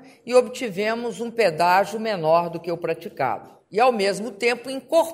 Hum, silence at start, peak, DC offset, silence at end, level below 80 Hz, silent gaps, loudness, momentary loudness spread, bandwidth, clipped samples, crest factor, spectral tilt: none; 0 s; -4 dBFS; under 0.1%; 0 s; -72 dBFS; none; -22 LUFS; 9 LU; 16 kHz; under 0.1%; 20 dB; -4.5 dB/octave